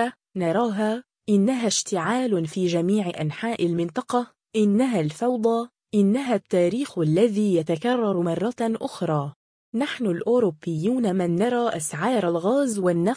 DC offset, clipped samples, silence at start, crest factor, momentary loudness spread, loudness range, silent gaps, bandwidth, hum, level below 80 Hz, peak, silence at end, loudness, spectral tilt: under 0.1%; under 0.1%; 0 s; 14 dB; 6 LU; 2 LU; 9.36-9.72 s; 10.5 kHz; none; -66 dBFS; -8 dBFS; 0 s; -24 LUFS; -5.5 dB/octave